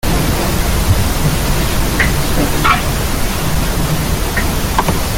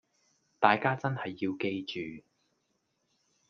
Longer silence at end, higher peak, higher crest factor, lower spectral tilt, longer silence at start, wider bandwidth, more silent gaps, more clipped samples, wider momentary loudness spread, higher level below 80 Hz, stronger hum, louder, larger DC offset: second, 0 s vs 1.3 s; first, 0 dBFS vs -6 dBFS; second, 14 dB vs 26 dB; second, -4.5 dB/octave vs -7 dB/octave; second, 0.05 s vs 0.6 s; first, 17 kHz vs 7 kHz; neither; neither; second, 4 LU vs 15 LU; first, -18 dBFS vs -76 dBFS; neither; first, -15 LUFS vs -31 LUFS; neither